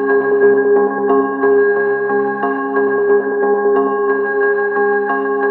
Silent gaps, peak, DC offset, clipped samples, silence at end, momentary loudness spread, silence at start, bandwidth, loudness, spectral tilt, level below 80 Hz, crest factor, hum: none; -2 dBFS; under 0.1%; under 0.1%; 0 s; 4 LU; 0 s; 3 kHz; -14 LUFS; -10 dB/octave; -72 dBFS; 12 dB; none